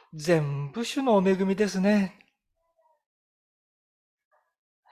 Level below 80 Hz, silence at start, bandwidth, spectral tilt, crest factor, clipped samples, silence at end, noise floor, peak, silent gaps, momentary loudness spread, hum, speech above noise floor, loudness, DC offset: -68 dBFS; 0.15 s; 13.5 kHz; -6.5 dB/octave; 18 dB; under 0.1%; 2.8 s; -76 dBFS; -10 dBFS; none; 9 LU; none; 52 dB; -25 LUFS; under 0.1%